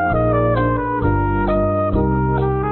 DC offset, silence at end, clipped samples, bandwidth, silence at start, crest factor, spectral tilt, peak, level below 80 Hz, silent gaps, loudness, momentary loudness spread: under 0.1%; 0 s; under 0.1%; 4.3 kHz; 0 s; 10 dB; -13.5 dB/octave; -6 dBFS; -26 dBFS; none; -18 LUFS; 2 LU